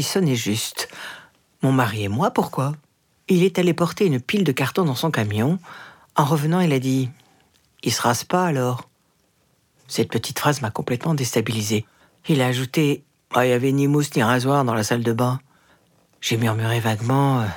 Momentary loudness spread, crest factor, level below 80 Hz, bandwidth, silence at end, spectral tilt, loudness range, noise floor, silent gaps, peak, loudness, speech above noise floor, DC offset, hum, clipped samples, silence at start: 10 LU; 20 dB; -66 dBFS; 19 kHz; 0 s; -5.5 dB/octave; 4 LU; -64 dBFS; none; -2 dBFS; -21 LUFS; 44 dB; under 0.1%; none; under 0.1%; 0 s